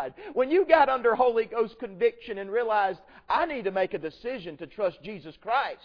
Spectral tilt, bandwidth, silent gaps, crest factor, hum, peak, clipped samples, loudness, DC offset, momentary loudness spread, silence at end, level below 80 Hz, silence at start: -7 dB/octave; 5.4 kHz; none; 20 dB; none; -6 dBFS; under 0.1%; -26 LUFS; under 0.1%; 16 LU; 0.1 s; -60 dBFS; 0 s